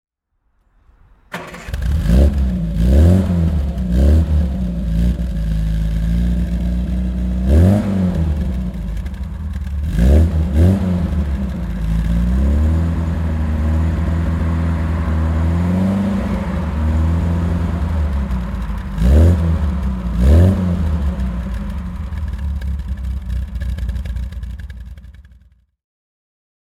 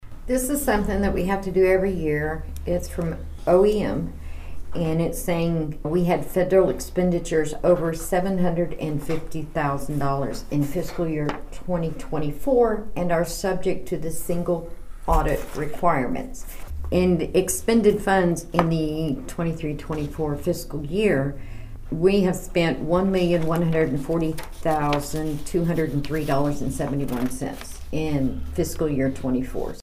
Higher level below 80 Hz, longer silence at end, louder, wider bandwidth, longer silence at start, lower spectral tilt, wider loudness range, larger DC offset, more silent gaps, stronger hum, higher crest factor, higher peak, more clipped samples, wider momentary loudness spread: first, -20 dBFS vs -34 dBFS; first, 1.6 s vs 0 s; first, -18 LUFS vs -24 LUFS; second, 11 kHz vs 15.5 kHz; first, 1.3 s vs 0 s; first, -8.5 dB/octave vs -6 dB/octave; first, 9 LU vs 4 LU; neither; neither; neither; second, 16 dB vs 22 dB; about the same, 0 dBFS vs 0 dBFS; neither; about the same, 12 LU vs 10 LU